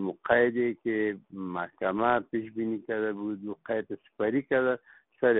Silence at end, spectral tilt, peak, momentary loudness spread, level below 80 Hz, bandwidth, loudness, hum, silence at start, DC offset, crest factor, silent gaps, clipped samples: 0 s; -1 dB/octave; -8 dBFS; 10 LU; -68 dBFS; 3.9 kHz; -29 LUFS; none; 0 s; under 0.1%; 22 dB; none; under 0.1%